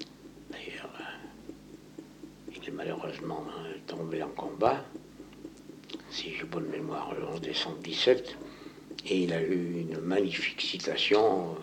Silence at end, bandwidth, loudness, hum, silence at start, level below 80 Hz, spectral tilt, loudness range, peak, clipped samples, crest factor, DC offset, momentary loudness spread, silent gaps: 0 s; 17 kHz; -32 LUFS; none; 0 s; -64 dBFS; -5 dB/octave; 11 LU; -10 dBFS; under 0.1%; 22 dB; under 0.1%; 22 LU; none